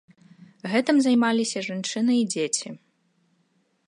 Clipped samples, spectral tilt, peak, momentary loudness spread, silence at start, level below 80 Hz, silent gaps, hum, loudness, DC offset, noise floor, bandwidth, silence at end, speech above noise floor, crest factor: under 0.1%; -3.5 dB/octave; -6 dBFS; 9 LU; 0.65 s; -76 dBFS; none; none; -23 LUFS; under 0.1%; -68 dBFS; 11.5 kHz; 1.1 s; 45 dB; 18 dB